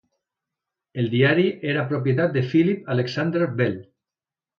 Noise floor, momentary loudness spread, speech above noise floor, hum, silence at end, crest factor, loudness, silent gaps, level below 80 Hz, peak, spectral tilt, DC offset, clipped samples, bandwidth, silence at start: under -90 dBFS; 7 LU; over 69 dB; none; 0.75 s; 18 dB; -22 LUFS; none; -62 dBFS; -6 dBFS; -8 dB/octave; under 0.1%; under 0.1%; 6.6 kHz; 0.95 s